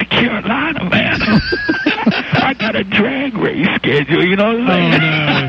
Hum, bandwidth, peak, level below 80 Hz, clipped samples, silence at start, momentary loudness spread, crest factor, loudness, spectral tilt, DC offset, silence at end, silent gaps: none; 7 kHz; -2 dBFS; -38 dBFS; under 0.1%; 0 s; 5 LU; 12 dB; -14 LUFS; -7 dB/octave; under 0.1%; 0 s; none